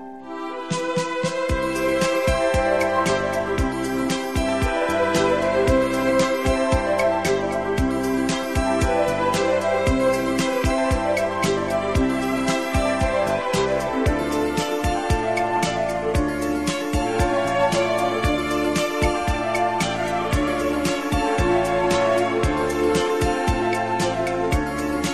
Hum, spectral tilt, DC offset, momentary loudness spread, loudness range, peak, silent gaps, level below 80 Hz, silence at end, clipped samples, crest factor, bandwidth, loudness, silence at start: none; -5 dB/octave; 0.4%; 4 LU; 2 LU; -6 dBFS; none; -32 dBFS; 0 s; under 0.1%; 16 dB; 13.5 kHz; -22 LUFS; 0 s